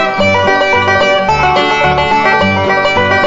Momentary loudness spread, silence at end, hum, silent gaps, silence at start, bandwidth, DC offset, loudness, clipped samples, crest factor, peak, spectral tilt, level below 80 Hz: 1 LU; 0 s; none; none; 0 s; 7.8 kHz; under 0.1%; -10 LUFS; under 0.1%; 10 dB; 0 dBFS; -5 dB/octave; -34 dBFS